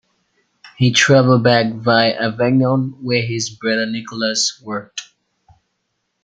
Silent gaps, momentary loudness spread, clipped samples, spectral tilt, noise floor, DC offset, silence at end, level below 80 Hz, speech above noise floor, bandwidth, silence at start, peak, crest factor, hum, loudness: none; 14 LU; under 0.1%; -4.5 dB/octave; -72 dBFS; under 0.1%; 1.2 s; -58 dBFS; 56 dB; 9.4 kHz; 0.65 s; 0 dBFS; 16 dB; none; -16 LUFS